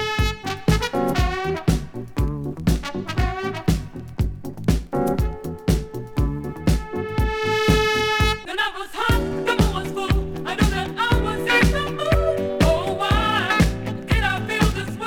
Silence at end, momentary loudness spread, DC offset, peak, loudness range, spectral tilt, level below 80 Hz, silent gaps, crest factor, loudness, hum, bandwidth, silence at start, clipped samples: 0 s; 8 LU; under 0.1%; -2 dBFS; 5 LU; -5.5 dB/octave; -28 dBFS; none; 18 dB; -22 LUFS; none; 18 kHz; 0 s; under 0.1%